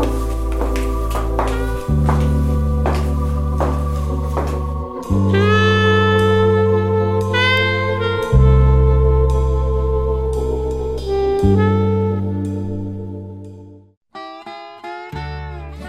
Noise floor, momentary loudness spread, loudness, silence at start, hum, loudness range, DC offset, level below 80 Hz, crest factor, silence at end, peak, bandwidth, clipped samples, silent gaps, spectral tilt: -38 dBFS; 16 LU; -17 LUFS; 0 s; none; 7 LU; under 0.1%; -22 dBFS; 14 dB; 0 s; -2 dBFS; 13 kHz; under 0.1%; 13.97-14.01 s; -7 dB/octave